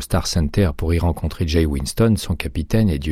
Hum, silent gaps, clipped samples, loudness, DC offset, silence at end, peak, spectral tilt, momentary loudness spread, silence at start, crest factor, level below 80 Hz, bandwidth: none; none; under 0.1%; -20 LUFS; under 0.1%; 0 s; -4 dBFS; -6 dB/octave; 5 LU; 0 s; 14 dB; -26 dBFS; 15.5 kHz